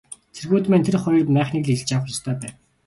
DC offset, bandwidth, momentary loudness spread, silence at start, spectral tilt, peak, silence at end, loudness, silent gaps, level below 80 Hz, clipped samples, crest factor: under 0.1%; 11.5 kHz; 15 LU; 0.1 s; -6.5 dB/octave; -6 dBFS; 0.35 s; -21 LUFS; none; -56 dBFS; under 0.1%; 16 dB